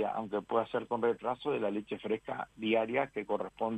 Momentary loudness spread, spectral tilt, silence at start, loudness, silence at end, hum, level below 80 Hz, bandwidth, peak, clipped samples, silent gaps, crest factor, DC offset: 6 LU; -7 dB/octave; 0 s; -34 LUFS; 0 s; none; -70 dBFS; 8.6 kHz; -16 dBFS; under 0.1%; none; 18 dB; under 0.1%